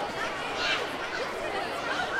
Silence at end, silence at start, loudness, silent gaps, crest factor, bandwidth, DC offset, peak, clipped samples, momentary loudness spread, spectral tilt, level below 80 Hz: 0 s; 0 s; -30 LUFS; none; 16 dB; 16.5 kHz; under 0.1%; -16 dBFS; under 0.1%; 4 LU; -2.5 dB/octave; -56 dBFS